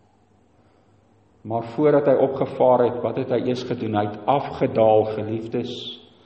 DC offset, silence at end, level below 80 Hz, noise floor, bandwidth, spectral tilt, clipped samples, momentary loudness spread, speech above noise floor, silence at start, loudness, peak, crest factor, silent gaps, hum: under 0.1%; 0.25 s; -60 dBFS; -59 dBFS; 8.2 kHz; -8 dB/octave; under 0.1%; 12 LU; 38 dB; 1.45 s; -21 LUFS; -6 dBFS; 16 dB; none; none